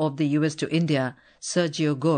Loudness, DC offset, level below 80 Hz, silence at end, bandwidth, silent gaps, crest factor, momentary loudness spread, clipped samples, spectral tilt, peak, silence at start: -25 LUFS; under 0.1%; -70 dBFS; 0 s; 9.4 kHz; none; 14 dB; 6 LU; under 0.1%; -5.5 dB/octave; -10 dBFS; 0 s